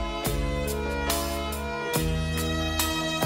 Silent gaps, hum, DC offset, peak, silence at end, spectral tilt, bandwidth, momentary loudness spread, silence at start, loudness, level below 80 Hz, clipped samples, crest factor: none; none; under 0.1%; -10 dBFS; 0 s; -4 dB/octave; 16.5 kHz; 4 LU; 0 s; -28 LUFS; -34 dBFS; under 0.1%; 16 dB